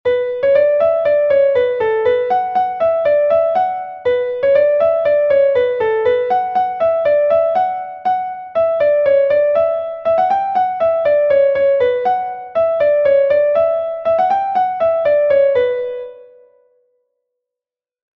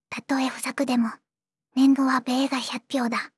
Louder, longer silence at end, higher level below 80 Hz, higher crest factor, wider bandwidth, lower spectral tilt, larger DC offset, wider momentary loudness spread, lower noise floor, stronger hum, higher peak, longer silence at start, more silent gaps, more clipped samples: first, -15 LUFS vs -24 LUFS; first, 1.95 s vs 0.1 s; first, -56 dBFS vs -78 dBFS; about the same, 12 dB vs 14 dB; second, 5.6 kHz vs 12 kHz; first, -6 dB/octave vs -3.5 dB/octave; neither; second, 6 LU vs 9 LU; first, -88 dBFS vs -77 dBFS; neither; first, -2 dBFS vs -10 dBFS; about the same, 0.05 s vs 0.1 s; neither; neither